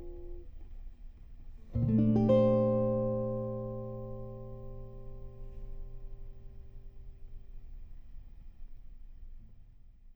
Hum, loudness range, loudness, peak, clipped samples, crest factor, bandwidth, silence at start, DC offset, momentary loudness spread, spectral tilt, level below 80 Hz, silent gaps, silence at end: none; 23 LU; -30 LUFS; -14 dBFS; under 0.1%; 20 dB; 5 kHz; 0 s; under 0.1%; 28 LU; -11 dB/octave; -46 dBFS; none; 0 s